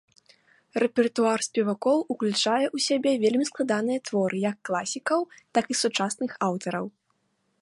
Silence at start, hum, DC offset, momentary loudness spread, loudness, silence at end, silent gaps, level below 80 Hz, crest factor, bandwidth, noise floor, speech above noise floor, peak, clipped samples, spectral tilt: 0.75 s; none; under 0.1%; 6 LU; -26 LUFS; 0.75 s; none; -74 dBFS; 18 dB; 11.5 kHz; -73 dBFS; 47 dB; -8 dBFS; under 0.1%; -4 dB/octave